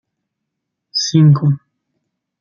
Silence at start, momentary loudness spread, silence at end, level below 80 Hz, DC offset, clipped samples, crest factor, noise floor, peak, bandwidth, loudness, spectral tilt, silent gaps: 0.95 s; 12 LU; 0.85 s; -60 dBFS; under 0.1%; under 0.1%; 14 dB; -77 dBFS; -2 dBFS; 7.2 kHz; -14 LUFS; -6 dB/octave; none